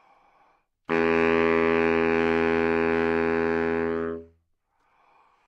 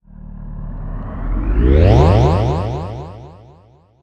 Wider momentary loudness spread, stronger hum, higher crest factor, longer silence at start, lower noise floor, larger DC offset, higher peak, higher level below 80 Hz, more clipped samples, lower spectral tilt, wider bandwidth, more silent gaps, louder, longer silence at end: second, 7 LU vs 22 LU; neither; about the same, 14 dB vs 16 dB; first, 0.9 s vs 0.15 s; first, -70 dBFS vs -48 dBFS; neither; second, -10 dBFS vs 0 dBFS; second, -56 dBFS vs -20 dBFS; neither; second, -7 dB/octave vs -8.5 dB/octave; second, 6.6 kHz vs 8 kHz; neither; second, -24 LUFS vs -15 LUFS; first, 1.2 s vs 0.7 s